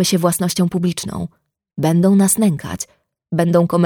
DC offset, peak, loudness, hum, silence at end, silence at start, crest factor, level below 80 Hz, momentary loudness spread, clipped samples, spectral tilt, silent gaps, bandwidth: under 0.1%; -2 dBFS; -17 LUFS; none; 0 s; 0 s; 14 dB; -50 dBFS; 15 LU; under 0.1%; -5.5 dB/octave; none; over 20 kHz